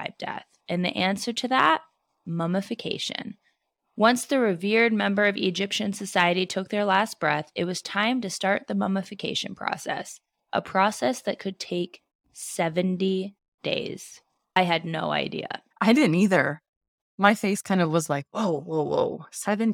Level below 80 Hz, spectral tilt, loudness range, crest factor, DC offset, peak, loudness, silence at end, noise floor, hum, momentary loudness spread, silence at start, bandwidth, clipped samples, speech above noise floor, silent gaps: -72 dBFS; -4.5 dB/octave; 5 LU; 22 dB; under 0.1%; -4 dBFS; -25 LUFS; 0 s; -72 dBFS; none; 13 LU; 0 s; 17 kHz; under 0.1%; 47 dB; 12.15-12.19 s, 13.48-13.58 s, 16.69-16.81 s, 16.88-17.18 s